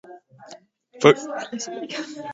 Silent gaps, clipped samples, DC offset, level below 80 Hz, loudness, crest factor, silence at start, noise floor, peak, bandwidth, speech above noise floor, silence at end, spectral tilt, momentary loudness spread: none; under 0.1%; under 0.1%; -68 dBFS; -22 LUFS; 24 dB; 0.1 s; -48 dBFS; 0 dBFS; 8 kHz; 26 dB; 0 s; -4.5 dB/octave; 14 LU